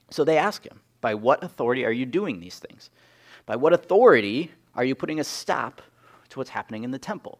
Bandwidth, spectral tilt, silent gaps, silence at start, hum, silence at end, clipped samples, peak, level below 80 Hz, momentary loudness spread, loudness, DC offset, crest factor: 15 kHz; -5 dB/octave; none; 0.1 s; none; 0.1 s; under 0.1%; -4 dBFS; -70 dBFS; 18 LU; -24 LUFS; under 0.1%; 22 dB